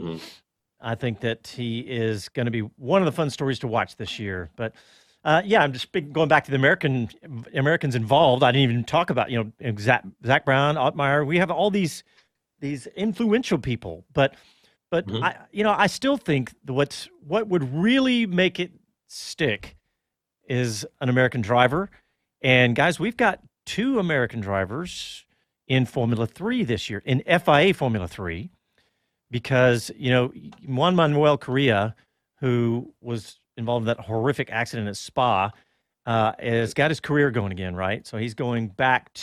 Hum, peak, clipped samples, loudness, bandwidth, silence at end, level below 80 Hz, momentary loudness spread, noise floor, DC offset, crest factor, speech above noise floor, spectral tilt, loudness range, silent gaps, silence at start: none; -2 dBFS; under 0.1%; -23 LUFS; 14 kHz; 0 s; -56 dBFS; 13 LU; -82 dBFS; under 0.1%; 20 dB; 59 dB; -6 dB/octave; 5 LU; none; 0 s